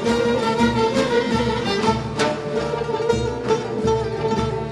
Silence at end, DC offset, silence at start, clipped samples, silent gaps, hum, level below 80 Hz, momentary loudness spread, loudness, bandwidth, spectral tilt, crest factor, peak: 0 s; under 0.1%; 0 s; under 0.1%; none; none; -40 dBFS; 4 LU; -21 LUFS; 12 kHz; -5.5 dB/octave; 16 dB; -4 dBFS